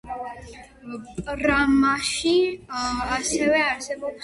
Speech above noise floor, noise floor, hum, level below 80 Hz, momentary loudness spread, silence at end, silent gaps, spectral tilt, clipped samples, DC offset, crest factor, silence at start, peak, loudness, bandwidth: 20 dB; -43 dBFS; none; -44 dBFS; 19 LU; 0 s; none; -3 dB/octave; under 0.1%; under 0.1%; 16 dB; 0.05 s; -8 dBFS; -22 LUFS; 11.5 kHz